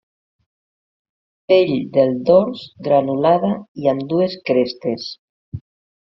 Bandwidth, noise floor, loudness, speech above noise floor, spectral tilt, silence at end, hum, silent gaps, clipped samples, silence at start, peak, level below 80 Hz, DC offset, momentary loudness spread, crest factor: 6 kHz; under -90 dBFS; -18 LUFS; over 73 dB; -5.5 dB/octave; 0.5 s; none; 3.68-3.75 s, 5.18-5.52 s; under 0.1%; 1.5 s; -2 dBFS; -58 dBFS; under 0.1%; 16 LU; 18 dB